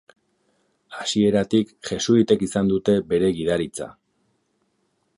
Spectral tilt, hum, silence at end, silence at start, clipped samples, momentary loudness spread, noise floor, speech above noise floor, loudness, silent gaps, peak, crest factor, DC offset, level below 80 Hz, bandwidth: -5.5 dB/octave; none; 1.25 s; 0.9 s; under 0.1%; 12 LU; -70 dBFS; 49 dB; -21 LUFS; none; -4 dBFS; 18 dB; under 0.1%; -52 dBFS; 11.5 kHz